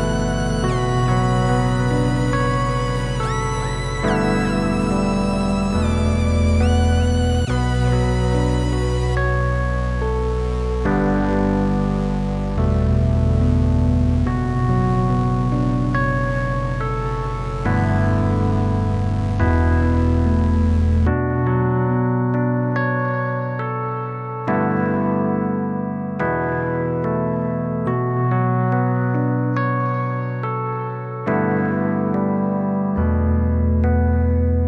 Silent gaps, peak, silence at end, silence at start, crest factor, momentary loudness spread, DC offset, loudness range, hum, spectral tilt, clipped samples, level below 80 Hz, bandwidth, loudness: none; -6 dBFS; 0 s; 0 s; 12 dB; 5 LU; under 0.1%; 3 LU; none; -7.5 dB/octave; under 0.1%; -28 dBFS; 11.5 kHz; -20 LUFS